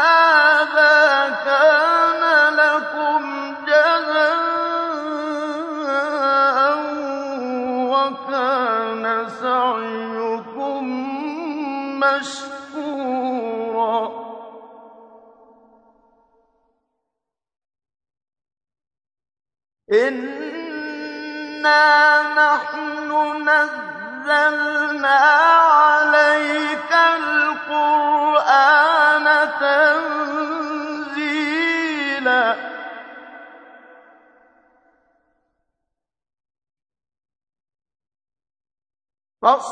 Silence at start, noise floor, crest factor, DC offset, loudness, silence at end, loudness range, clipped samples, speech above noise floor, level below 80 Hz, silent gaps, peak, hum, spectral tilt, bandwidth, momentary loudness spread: 0 s; -83 dBFS; 18 dB; under 0.1%; -17 LUFS; 0 s; 12 LU; under 0.1%; 67 dB; -74 dBFS; none; -2 dBFS; none; -2.5 dB/octave; 9.8 kHz; 15 LU